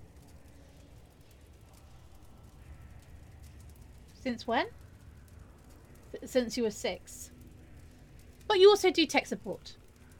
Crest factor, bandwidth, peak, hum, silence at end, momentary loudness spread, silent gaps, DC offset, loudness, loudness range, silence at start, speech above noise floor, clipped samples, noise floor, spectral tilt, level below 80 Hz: 24 dB; 17 kHz; -10 dBFS; none; 0.45 s; 31 LU; none; under 0.1%; -29 LUFS; 17 LU; 0 s; 28 dB; under 0.1%; -56 dBFS; -3.5 dB/octave; -56 dBFS